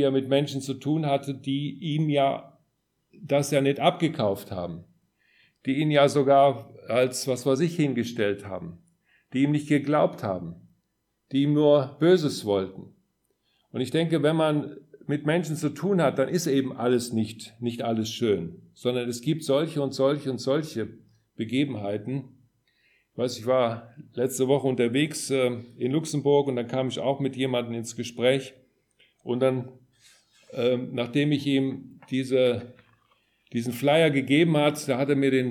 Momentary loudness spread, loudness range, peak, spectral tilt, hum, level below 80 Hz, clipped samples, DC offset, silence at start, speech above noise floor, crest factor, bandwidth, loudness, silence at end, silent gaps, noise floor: 13 LU; 5 LU; -6 dBFS; -6 dB/octave; none; -70 dBFS; under 0.1%; under 0.1%; 0 s; 51 dB; 20 dB; 17.5 kHz; -25 LUFS; 0 s; none; -76 dBFS